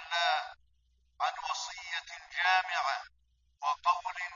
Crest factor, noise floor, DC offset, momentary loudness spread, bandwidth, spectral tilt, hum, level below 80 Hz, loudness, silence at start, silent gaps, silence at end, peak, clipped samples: 20 dB; -71 dBFS; under 0.1%; 11 LU; 7.4 kHz; 3 dB/octave; none; -72 dBFS; -32 LUFS; 0 s; none; 0 s; -14 dBFS; under 0.1%